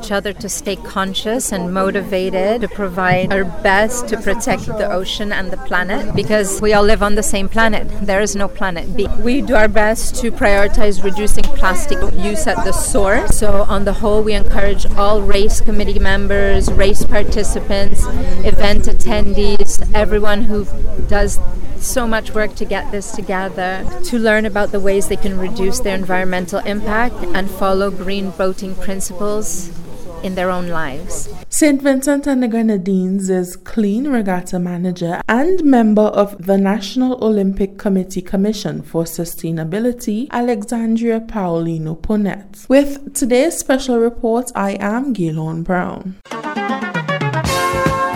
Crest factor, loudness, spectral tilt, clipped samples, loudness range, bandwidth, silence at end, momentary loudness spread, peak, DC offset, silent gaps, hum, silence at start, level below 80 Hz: 12 dB; -17 LUFS; -5 dB/octave; 0.2%; 4 LU; 14 kHz; 0 s; 8 LU; 0 dBFS; under 0.1%; none; none; 0 s; -22 dBFS